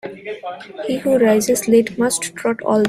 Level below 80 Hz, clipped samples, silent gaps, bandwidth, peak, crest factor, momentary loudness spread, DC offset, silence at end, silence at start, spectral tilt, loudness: -56 dBFS; under 0.1%; none; 16 kHz; -2 dBFS; 16 dB; 15 LU; under 0.1%; 0 s; 0.05 s; -4 dB/octave; -17 LUFS